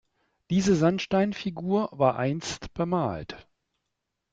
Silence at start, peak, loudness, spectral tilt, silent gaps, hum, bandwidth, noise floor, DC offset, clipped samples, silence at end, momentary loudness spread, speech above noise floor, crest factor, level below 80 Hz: 0.5 s; -8 dBFS; -26 LUFS; -6 dB/octave; none; none; 8 kHz; -82 dBFS; under 0.1%; under 0.1%; 0.9 s; 11 LU; 56 dB; 20 dB; -56 dBFS